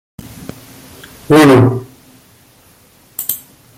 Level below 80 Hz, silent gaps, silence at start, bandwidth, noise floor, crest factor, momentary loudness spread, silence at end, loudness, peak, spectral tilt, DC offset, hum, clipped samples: -48 dBFS; none; 0.4 s; 17 kHz; -47 dBFS; 16 dB; 26 LU; 0.4 s; -11 LUFS; 0 dBFS; -6 dB/octave; under 0.1%; none; under 0.1%